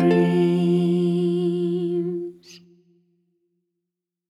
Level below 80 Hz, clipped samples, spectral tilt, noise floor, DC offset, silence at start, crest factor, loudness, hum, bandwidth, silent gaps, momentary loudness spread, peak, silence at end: -78 dBFS; under 0.1%; -8.5 dB/octave; -84 dBFS; under 0.1%; 0 s; 16 dB; -21 LUFS; none; 10.5 kHz; none; 10 LU; -8 dBFS; 1.75 s